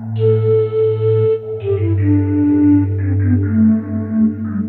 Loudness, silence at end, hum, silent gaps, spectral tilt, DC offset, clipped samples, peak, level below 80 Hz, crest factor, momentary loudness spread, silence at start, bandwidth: -15 LUFS; 0 s; none; none; -13 dB/octave; under 0.1%; under 0.1%; -4 dBFS; -56 dBFS; 10 dB; 5 LU; 0 s; 3.8 kHz